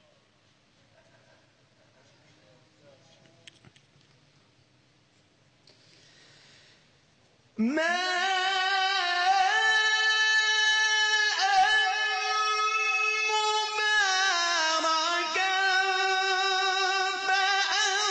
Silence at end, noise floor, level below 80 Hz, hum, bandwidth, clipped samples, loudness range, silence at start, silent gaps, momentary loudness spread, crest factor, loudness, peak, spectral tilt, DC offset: 0 s; -64 dBFS; -76 dBFS; none; 9.8 kHz; under 0.1%; 7 LU; 7.55 s; none; 4 LU; 14 dB; -24 LUFS; -14 dBFS; 0 dB/octave; under 0.1%